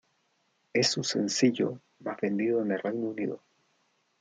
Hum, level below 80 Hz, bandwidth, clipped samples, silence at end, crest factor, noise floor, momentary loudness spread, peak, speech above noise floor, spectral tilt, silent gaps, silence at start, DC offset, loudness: none; -78 dBFS; 9.6 kHz; under 0.1%; 0.85 s; 20 dB; -73 dBFS; 11 LU; -10 dBFS; 45 dB; -4 dB/octave; none; 0.75 s; under 0.1%; -29 LUFS